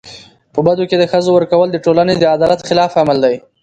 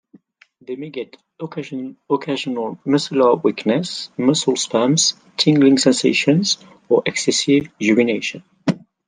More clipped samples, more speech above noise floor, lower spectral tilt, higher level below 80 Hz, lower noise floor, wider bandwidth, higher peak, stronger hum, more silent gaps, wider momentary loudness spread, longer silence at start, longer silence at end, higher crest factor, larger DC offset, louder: neither; second, 26 dB vs 36 dB; first, -6 dB/octave vs -4 dB/octave; first, -50 dBFS vs -64 dBFS; second, -38 dBFS vs -54 dBFS; second, 9 kHz vs 10 kHz; about the same, 0 dBFS vs -2 dBFS; neither; neither; second, 3 LU vs 15 LU; second, 0.05 s vs 0.7 s; about the same, 0.25 s vs 0.3 s; about the same, 12 dB vs 16 dB; neither; first, -13 LUFS vs -18 LUFS